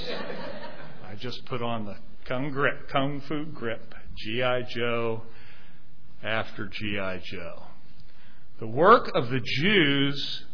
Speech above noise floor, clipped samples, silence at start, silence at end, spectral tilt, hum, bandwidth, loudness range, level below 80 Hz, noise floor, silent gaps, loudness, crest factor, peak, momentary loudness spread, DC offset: 28 dB; under 0.1%; 0 s; 0.1 s; -6.5 dB/octave; none; 5.4 kHz; 10 LU; -54 dBFS; -55 dBFS; none; -27 LUFS; 24 dB; -4 dBFS; 20 LU; 4%